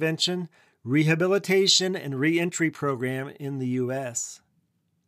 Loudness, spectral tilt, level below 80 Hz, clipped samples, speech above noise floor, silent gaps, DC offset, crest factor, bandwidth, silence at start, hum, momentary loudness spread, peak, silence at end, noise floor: -25 LUFS; -4 dB/octave; -78 dBFS; under 0.1%; 46 dB; none; under 0.1%; 18 dB; 15.5 kHz; 0 s; none; 13 LU; -8 dBFS; 0.7 s; -71 dBFS